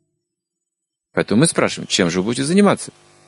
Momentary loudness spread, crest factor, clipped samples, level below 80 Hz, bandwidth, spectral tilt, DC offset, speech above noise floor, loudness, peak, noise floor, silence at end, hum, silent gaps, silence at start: 9 LU; 18 dB; under 0.1%; -54 dBFS; 11.5 kHz; -4.5 dB/octave; under 0.1%; 64 dB; -17 LUFS; 0 dBFS; -81 dBFS; 0.4 s; none; none; 1.15 s